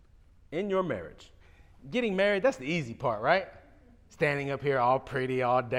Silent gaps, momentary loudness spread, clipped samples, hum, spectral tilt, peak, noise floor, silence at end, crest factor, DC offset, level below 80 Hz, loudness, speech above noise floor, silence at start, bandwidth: none; 9 LU; under 0.1%; none; -6 dB/octave; -10 dBFS; -58 dBFS; 0 s; 20 dB; under 0.1%; -58 dBFS; -29 LUFS; 29 dB; 0.5 s; 12 kHz